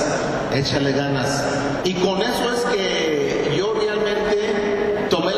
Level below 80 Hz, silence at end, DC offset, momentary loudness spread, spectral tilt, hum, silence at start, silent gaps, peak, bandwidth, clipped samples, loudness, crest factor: -46 dBFS; 0 s; under 0.1%; 2 LU; -4.5 dB/octave; none; 0 s; none; -8 dBFS; 13 kHz; under 0.1%; -20 LUFS; 12 dB